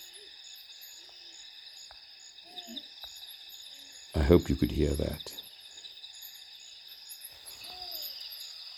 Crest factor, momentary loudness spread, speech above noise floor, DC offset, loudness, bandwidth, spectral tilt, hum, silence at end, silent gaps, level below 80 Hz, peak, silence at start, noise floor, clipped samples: 28 dB; 17 LU; 25 dB; under 0.1%; -34 LUFS; 18.5 kHz; -5.5 dB/octave; none; 0 s; none; -44 dBFS; -6 dBFS; 0 s; -52 dBFS; under 0.1%